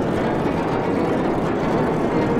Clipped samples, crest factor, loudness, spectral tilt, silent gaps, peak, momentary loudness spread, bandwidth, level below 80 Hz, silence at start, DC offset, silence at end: under 0.1%; 12 dB; -21 LUFS; -7.5 dB/octave; none; -8 dBFS; 1 LU; 15 kHz; -40 dBFS; 0 s; under 0.1%; 0 s